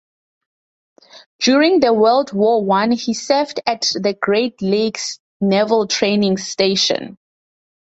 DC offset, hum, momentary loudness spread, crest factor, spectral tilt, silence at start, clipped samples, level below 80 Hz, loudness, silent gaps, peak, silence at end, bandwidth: under 0.1%; none; 8 LU; 16 dB; -4 dB/octave; 1.15 s; under 0.1%; -60 dBFS; -16 LUFS; 1.26-1.39 s, 5.20-5.40 s; 0 dBFS; 0.85 s; 8.2 kHz